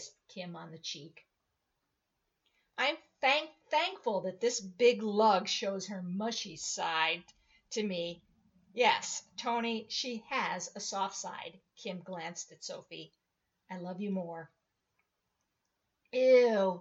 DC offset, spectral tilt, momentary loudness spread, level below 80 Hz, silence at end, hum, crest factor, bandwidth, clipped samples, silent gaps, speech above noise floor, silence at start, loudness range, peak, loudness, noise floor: under 0.1%; -3 dB/octave; 18 LU; -82 dBFS; 0 s; none; 22 dB; 8 kHz; under 0.1%; none; 50 dB; 0 s; 12 LU; -14 dBFS; -33 LUFS; -83 dBFS